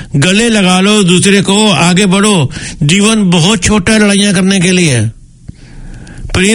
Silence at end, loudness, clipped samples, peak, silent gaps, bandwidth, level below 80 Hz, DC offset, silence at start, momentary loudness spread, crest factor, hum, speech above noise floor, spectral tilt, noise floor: 0 s; -8 LUFS; 0.7%; 0 dBFS; none; 13 kHz; -32 dBFS; under 0.1%; 0 s; 6 LU; 8 dB; none; 24 dB; -4 dB/octave; -32 dBFS